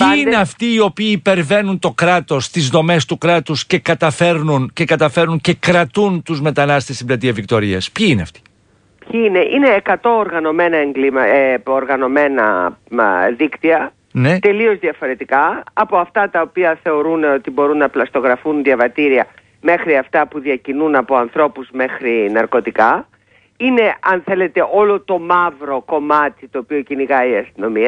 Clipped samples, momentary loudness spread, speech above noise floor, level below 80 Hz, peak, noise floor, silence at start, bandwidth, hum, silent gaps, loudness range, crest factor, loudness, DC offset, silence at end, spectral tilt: under 0.1%; 6 LU; 39 dB; -50 dBFS; 0 dBFS; -54 dBFS; 0 s; 10.5 kHz; none; none; 2 LU; 14 dB; -15 LUFS; under 0.1%; 0 s; -5.5 dB/octave